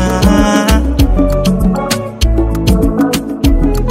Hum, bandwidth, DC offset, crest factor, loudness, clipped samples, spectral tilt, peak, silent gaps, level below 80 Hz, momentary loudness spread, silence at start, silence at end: none; 16.5 kHz; under 0.1%; 10 dB; -12 LUFS; under 0.1%; -6 dB/octave; 0 dBFS; none; -14 dBFS; 5 LU; 0 s; 0 s